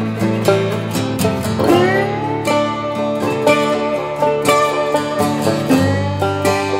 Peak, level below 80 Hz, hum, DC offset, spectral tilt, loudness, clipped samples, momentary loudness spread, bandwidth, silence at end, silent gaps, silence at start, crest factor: 0 dBFS; -48 dBFS; none; under 0.1%; -5.5 dB/octave; -16 LUFS; under 0.1%; 5 LU; 16.5 kHz; 0 s; none; 0 s; 16 dB